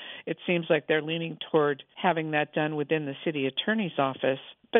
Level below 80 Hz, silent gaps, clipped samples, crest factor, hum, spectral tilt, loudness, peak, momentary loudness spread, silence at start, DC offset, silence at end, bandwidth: -80 dBFS; none; under 0.1%; 20 dB; none; -9 dB/octave; -28 LUFS; -6 dBFS; 6 LU; 0 s; under 0.1%; 0 s; 3.9 kHz